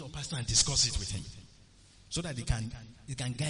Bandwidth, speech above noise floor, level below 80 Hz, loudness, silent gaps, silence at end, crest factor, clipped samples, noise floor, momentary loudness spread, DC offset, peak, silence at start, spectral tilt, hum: 10.5 kHz; 26 dB; -44 dBFS; -31 LUFS; none; 0 s; 20 dB; under 0.1%; -58 dBFS; 17 LU; under 0.1%; -14 dBFS; 0 s; -2.5 dB/octave; none